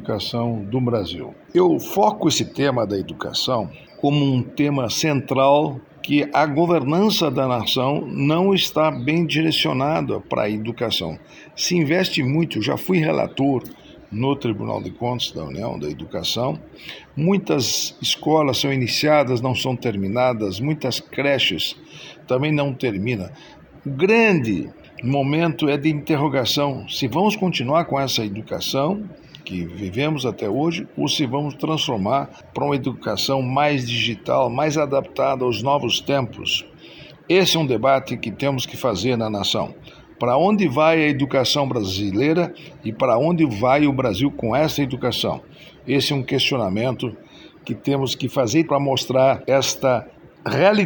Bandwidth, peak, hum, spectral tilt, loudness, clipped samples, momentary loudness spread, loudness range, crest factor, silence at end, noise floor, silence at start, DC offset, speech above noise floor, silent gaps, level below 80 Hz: over 20 kHz; -4 dBFS; none; -5 dB/octave; -20 LUFS; under 0.1%; 10 LU; 4 LU; 16 dB; 0 s; -42 dBFS; 0 s; under 0.1%; 22 dB; none; -54 dBFS